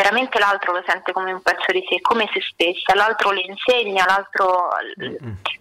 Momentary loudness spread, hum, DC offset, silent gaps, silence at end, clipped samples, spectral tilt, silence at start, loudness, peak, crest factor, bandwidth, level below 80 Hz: 8 LU; none; under 0.1%; none; 0.05 s; under 0.1%; -3 dB/octave; 0 s; -19 LUFS; -8 dBFS; 12 dB; 16 kHz; -58 dBFS